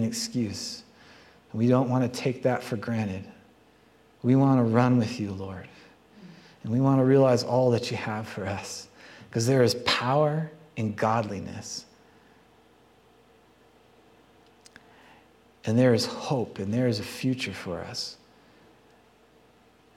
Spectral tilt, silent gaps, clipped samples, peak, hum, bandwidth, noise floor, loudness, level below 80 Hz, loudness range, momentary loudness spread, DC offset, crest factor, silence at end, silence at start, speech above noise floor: -6 dB/octave; none; under 0.1%; -6 dBFS; none; 14.5 kHz; -59 dBFS; -26 LUFS; -66 dBFS; 9 LU; 16 LU; under 0.1%; 22 dB; 1.85 s; 0 s; 34 dB